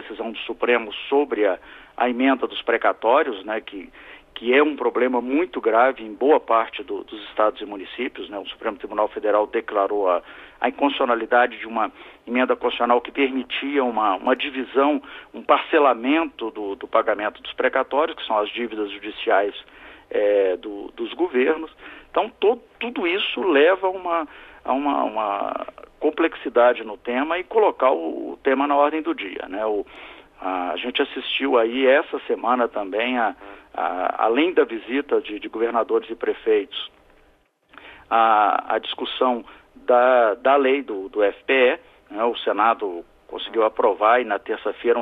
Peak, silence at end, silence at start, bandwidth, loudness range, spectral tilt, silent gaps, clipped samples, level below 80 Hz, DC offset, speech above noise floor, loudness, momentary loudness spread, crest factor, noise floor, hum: -4 dBFS; 0 s; 0 s; 4.4 kHz; 4 LU; -6 dB/octave; none; under 0.1%; -60 dBFS; under 0.1%; 38 dB; -21 LUFS; 13 LU; 18 dB; -59 dBFS; none